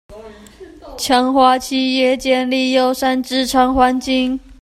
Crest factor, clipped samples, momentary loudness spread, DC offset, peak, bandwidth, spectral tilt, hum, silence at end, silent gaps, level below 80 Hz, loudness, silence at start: 16 dB; under 0.1%; 5 LU; under 0.1%; 0 dBFS; 15 kHz; -3 dB/octave; none; 0.1 s; none; -42 dBFS; -15 LUFS; 0.1 s